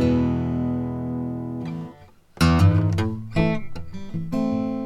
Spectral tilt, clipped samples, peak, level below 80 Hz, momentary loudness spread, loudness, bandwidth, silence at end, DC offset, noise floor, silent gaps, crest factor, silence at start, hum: -7.5 dB/octave; under 0.1%; -6 dBFS; -38 dBFS; 16 LU; -23 LUFS; 14 kHz; 0 s; under 0.1%; -47 dBFS; none; 16 dB; 0 s; none